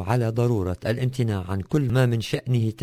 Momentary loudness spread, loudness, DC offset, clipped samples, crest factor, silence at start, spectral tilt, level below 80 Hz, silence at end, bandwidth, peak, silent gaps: 5 LU; -24 LUFS; under 0.1%; under 0.1%; 16 dB; 0 s; -7.5 dB/octave; -42 dBFS; 0 s; 16 kHz; -8 dBFS; none